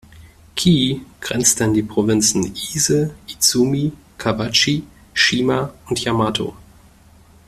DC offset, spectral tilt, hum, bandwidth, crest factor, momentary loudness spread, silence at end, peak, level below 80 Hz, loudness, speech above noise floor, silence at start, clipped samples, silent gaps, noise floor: under 0.1%; -3.5 dB/octave; none; 15.5 kHz; 18 dB; 10 LU; 0.85 s; 0 dBFS; -46 dBFS; -18 LUFS; 30 dB; 0.15 s; under 0.1%; none; -48 dBFS